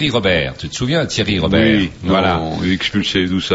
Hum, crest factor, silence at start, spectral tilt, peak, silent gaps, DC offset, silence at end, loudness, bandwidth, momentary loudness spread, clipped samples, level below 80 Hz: none; 14 dB; 0 s; -5 dB/octave; -2 dBFS; none; under 0.1%; 0 s; -16 LUFS; 8 kHz; 5 LU; under 0.1%; -36 dBFS